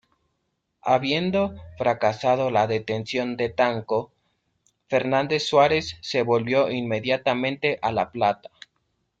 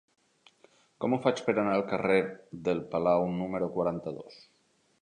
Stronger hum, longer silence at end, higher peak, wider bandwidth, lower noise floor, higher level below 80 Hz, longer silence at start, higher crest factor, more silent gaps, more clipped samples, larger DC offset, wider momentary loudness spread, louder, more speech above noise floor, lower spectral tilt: neither; first, 0.85 s vs 0.7 s; first, -6 dBFS vs -10 dBFS; second, 9 kHz vs 10 kHz; first, -76 dBFS vs -64 dBFS; about the same, -60 dBFS vs -64 dBFS; second, 0.85 s vs 1 s; about the same, 18 dB vs 20 dB; neither; neither; neither; second, 6 LU vs 11 LU; first, -23 LUFS vs -30 LUFS; first, 53 dB vs 34 dB; second, -5.5 dB/octave vs -7 dB/octave